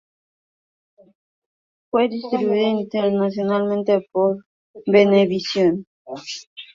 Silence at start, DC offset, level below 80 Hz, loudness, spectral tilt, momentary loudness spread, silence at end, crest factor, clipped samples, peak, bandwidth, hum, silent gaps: 1.95 s; under 0.1%; -64 dBFS; -19 LUFS; -6.5 dB/octave; 16 LU; 0.1 s; 20 dB; under 0.1%; -2 dBFS; 7.6 kHz; none; 4.46-4.74 s, 5.87-6.05 s, 6.47-6.56 s